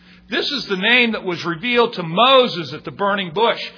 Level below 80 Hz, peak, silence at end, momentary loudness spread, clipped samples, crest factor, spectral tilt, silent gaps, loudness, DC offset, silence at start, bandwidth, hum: -58 dBFS; 0 dBFS; 0.05 s; 11 LU; under 0.1%; 18 dB; -5 dB/octave; none; -17 LUFS; under 0.1%; 0.3 s; 5.4 kHz; none